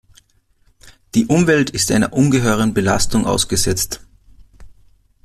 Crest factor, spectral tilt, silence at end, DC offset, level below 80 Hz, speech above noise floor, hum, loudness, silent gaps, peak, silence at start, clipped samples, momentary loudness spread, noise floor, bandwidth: 16 dB; -4.5 dB/octave; 0.55 s; under 0.1%; -38 dBFS; 41 dB; none; -16 LUFS; none; -2 dBFS; 0.85 s; under 0.1%; 6 LU; -57 dBFS; 15 kHz